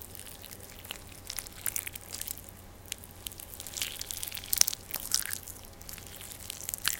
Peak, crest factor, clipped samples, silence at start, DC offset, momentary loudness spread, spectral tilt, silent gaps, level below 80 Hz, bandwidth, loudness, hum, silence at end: 0 dBFS; 38 dB; under 0.1%; 0 s; under 0.1%; 17 LU; 0 dB/octave; none; -56 dBFS; 17 kHz; -34 LUFS; none; 0 s